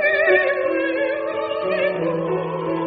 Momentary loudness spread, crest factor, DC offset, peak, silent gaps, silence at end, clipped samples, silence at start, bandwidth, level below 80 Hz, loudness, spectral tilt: 8 LU; 16 dB; under 0.1%; -4 dBFS; none; 0 s; under 0.1%; 0 s; 5 kHz; -60 dBFS; -20 LUFS; -3.5 dB/octave